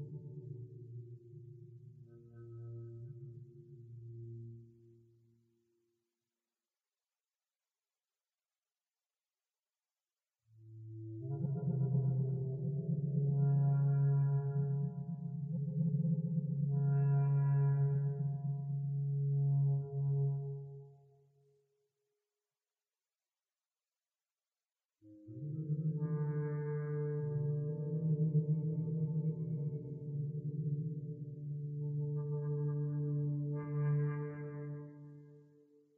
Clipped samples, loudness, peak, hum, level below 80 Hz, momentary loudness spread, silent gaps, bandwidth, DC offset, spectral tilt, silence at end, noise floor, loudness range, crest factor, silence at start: under 0.1%; -36 LUFS; -24 dBFS; none; -76 dBFS; 21 LU; none; 2.2 kHz; under 0.1%; -11.5 dB/octave; 0.55 s; under -90 dBFS; 18 LU; 14 dB; 0 s